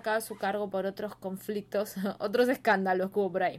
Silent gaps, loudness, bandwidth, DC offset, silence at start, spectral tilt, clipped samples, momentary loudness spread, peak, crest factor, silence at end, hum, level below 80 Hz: none; -30 LUFS; 16 kHz; under 0.1%; 0.05 s; -5 dB/octave; under 0.1%; 10 LU; -14 dBFS; 16 dB; 0 s; none; -70 dBFS